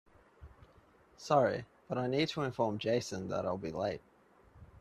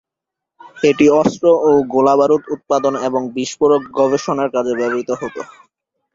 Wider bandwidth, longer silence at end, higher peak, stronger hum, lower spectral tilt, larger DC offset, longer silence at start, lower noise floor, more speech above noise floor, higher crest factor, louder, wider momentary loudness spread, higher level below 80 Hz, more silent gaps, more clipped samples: first, 13 kHz vs 7.8 kHz; second, 0 s vs 0.7 s; second, -14 dBFS vs 0 dBFS; neither; about the same, -5.5 dB/octave vs -5.5 dB/octave; neither; second, 0.4 s vs 0.65 s; second, -64 dBFS vs -83 dBFS; second, 30 dB vs 68 dB; first, 22 dB vs 16 dB; second, -34 LUFS vs -15 LUFS; about the same, 11 LU vs 11 LU; second, -66 dBFS vs -56 dBFS; neither; neither